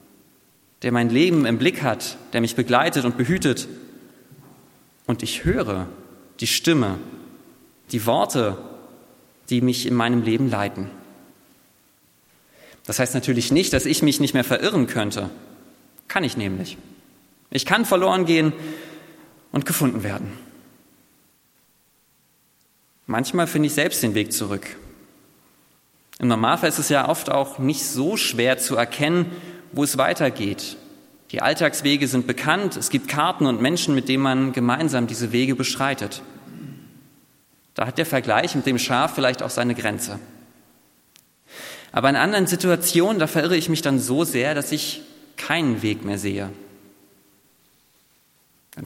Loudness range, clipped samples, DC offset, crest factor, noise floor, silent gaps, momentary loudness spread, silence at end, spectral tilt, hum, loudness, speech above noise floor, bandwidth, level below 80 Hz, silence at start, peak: 6 LU; under 0.1%; under 0.1%; 22 dB; -62 dBFS; none; 16 LU; 0 s; -4.5 dB/octave; none; -21 LUFS; 40 dB; 17 kHz; -54 dBFS; 0.8 s; 0 dBFS